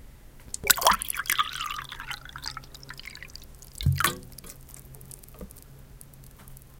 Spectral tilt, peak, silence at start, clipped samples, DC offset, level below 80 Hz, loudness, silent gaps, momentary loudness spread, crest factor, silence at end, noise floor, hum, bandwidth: -2 dB/octave; 0 dBFS; 0 s; under 0.1%; under 0.1%; -46 dBFS; -26 LUFS; none; 26 LU; 32 dB; 0 s; -48 dBFS; none; 17 kHz